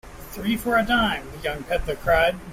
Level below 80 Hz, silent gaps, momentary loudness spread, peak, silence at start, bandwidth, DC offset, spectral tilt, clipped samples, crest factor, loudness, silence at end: -38 dBFS; none; 10 LU; -6 dBFS; 0.05 s; 16 kHz; under 0.1%; -4.5 dB/octave; under 0.1%; 16 dB; -23 LUFS; 0 s